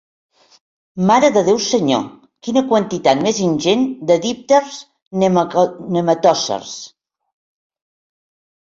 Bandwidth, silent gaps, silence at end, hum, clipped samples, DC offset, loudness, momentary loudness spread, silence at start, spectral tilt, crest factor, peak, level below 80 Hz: 7.8 kHz; 5.02-5.11 s; 1.75 s; none; under 0.1%; under 0.1%; -16 LUFS; 17 LU; 0.95 s; -5 dB/octave; 16 dB; -2 dBFS; -58 dBFS